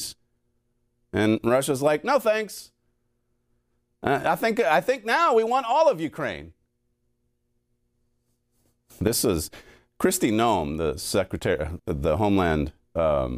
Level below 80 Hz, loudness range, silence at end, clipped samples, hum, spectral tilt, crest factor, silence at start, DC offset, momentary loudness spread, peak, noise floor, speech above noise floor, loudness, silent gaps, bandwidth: -46 dBFS; 8 LU; 0 s; under 0.1%; none; -4.5 dB/octave; 20 dB; 0 s; under 0.1%; 10 LU; -6 dBFS; -72 dBFS; 49 dB; -24 LUFS; none; 16 kHz